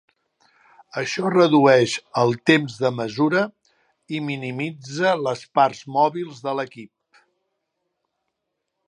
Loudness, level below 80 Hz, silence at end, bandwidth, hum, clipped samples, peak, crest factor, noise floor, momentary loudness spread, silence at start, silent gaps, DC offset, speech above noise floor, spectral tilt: -21 LUFS; -70 dBFS; 2 s; 11 kHz; none; under 0.1%; -2 dBFS; 20 dB; -79 dBFS; 13 LU; 0.95 s; none; under 0.1%; 59 dB; -5.5 dB/octave